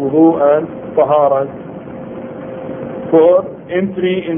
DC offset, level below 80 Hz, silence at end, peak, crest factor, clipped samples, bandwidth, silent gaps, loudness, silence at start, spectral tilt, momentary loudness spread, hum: under 0.1%; -52 dBFS; 0 s; 0 dBFS; 14 dB; under 0.1%; 3.7 kHz; none; -13 LUFS; 0 s; -12 dB/octave; 18 LU; none